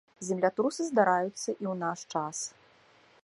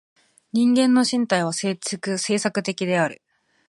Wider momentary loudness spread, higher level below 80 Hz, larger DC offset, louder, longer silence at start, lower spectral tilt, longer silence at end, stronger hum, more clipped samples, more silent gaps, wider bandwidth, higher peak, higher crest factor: about the same, 10 LU vs 9 LU; second, -80 dBFS vs -72 dBFS; neither; second, -30 LUFS vs -22 LUFS; second, 0.2 s vs 0.55 s; about the same, -4.5 dB/octave vs -4 dB/octave; first, 0.75 s vs 0.55 s; neither; neither; neither; about the same, 11.5 kHz vs 11.5 kHz; second, -10 dBFS vs -4 dBFS; about the same, 22 dB vs 18 dB